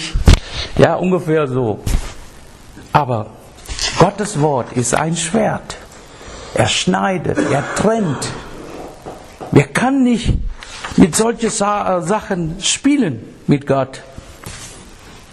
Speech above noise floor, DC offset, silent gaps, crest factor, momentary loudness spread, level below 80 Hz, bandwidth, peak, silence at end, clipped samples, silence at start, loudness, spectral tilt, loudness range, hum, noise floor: 23 dB; under 0.1%; none; 16 dB; 19 LU; -26 dBFS; 13.5 kHz; 0 dBFS; 0.1 s; under 0.1%; 0 s; -16 LUFS; -5 dB/octave; 3 LU; none; -38 dBFS